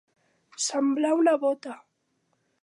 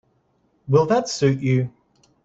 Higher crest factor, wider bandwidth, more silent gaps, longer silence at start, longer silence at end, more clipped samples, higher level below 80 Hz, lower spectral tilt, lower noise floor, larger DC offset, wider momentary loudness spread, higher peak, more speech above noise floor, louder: about the same, 16 dB vs 18 dB; first, 11.5 kHz vs 7.8 kHz; neither; about the same, 0.6 s vs 0.65 s; first, 0.85 s vs 0.55 s; neither; second, -88 dBFS vs -58 dBFS; second, -2 dB/octave vs -6.5 dB/octave; first, -74 dBFS vs -65 dBFS; neither; first, 17 LU vs 5 LU; second, -12 dBFS vs -4 dBFS; about the same, 49 dB vs 46 dB; second, -25 LUFS vs -20 LUFS